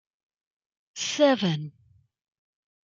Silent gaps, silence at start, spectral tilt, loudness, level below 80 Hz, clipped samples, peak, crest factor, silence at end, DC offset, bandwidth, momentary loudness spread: none; 0.95 s; -4.5 dB/octave; -25 LUFS; -74 dBFS; under 0.1%; -8 dBFS; 22 dB; 1.15 s; under 0.1%; 7.8 kHz; 21 LU